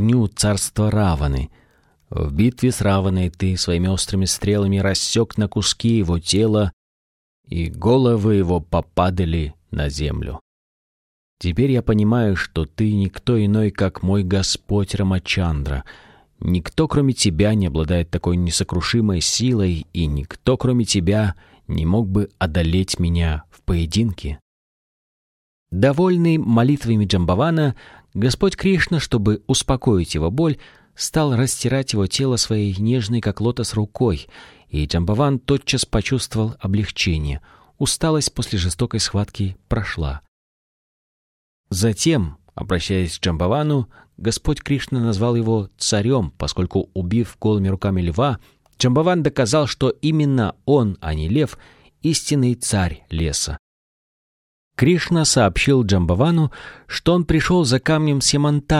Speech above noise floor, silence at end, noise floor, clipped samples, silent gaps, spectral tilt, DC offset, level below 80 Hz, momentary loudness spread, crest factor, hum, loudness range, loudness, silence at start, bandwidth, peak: over 71 dB; 0 s; under -90 dBFS; under 0.1%; 6.73-7.44 s, 10.41-11.37 s, 24.42-25.66 s, 40.28-41.64 s, 53.59-54.71 s; -5.5 dB/octave; under 0.1%; -34 dBFS; 8 LU; 16 dB; none; 4 LU; -19 LUFS; 0 s; 15 kHz; -2 dBFS